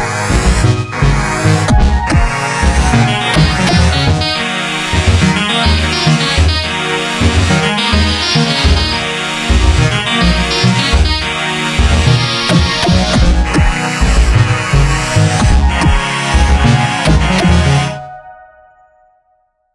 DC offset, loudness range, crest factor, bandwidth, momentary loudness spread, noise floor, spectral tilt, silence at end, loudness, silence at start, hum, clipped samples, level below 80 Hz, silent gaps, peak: under 0.1%; 1 LU; 12 dB; 11.5 kHz; 4 LU; -58 dBFS; -4.5 dB/octave; 1.4 s; -12 LUFS; 0 s; none; under 0.1%; -16 dBFS; none; 0 dBFS